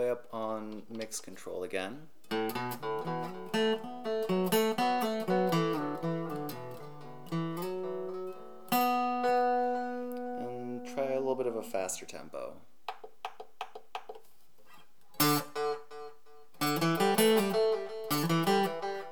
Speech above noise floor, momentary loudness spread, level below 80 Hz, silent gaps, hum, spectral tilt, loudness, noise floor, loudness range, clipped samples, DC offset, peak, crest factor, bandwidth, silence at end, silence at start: 28 dB; 18 LU; -82 dBFS; none; none; -4.5 dB/octave; -32 LUFS; -65 dBFS; 8 LU; under 0.1%; 0.4%; -12 dBFS; 22 dB; over 20 kHz; 0 s; 0 s